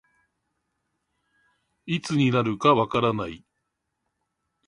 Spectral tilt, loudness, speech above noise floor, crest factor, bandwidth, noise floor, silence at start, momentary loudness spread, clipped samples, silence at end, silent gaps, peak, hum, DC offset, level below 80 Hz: -6.5 dB/octave; -23 LUFS; 57 dB; 22 dB; 11.5 kHz; -79 dBFS; 1.85 s; 12 LU; under 0.1%; 1.3 s; none; -6 dBFS; none; under 0.1%; -60 dBFS